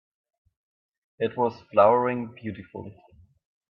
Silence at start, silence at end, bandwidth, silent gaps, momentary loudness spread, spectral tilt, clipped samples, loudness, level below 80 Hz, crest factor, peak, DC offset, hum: 1.2 s; 0.8 s; 5.8 kHz; none; 22 LU; -9 dB/octave; under 0.1%; -24 LUFS; -68 dBFS; 22 dB; -6 dBFS; under 0.1%; none